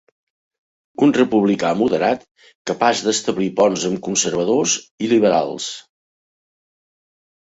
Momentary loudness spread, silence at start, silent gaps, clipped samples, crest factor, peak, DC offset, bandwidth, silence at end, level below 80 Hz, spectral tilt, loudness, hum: 12 LU; 1 s; 2.31-2.35 s, 2.55-2.65 s, 4.91-4.98 s; under 0.1%; 18 dB; -2 dBFS; under 0.1%; 8 kHz; 1.8 s; -60 dBFS; -4 dB/octave; -18 LUFS; none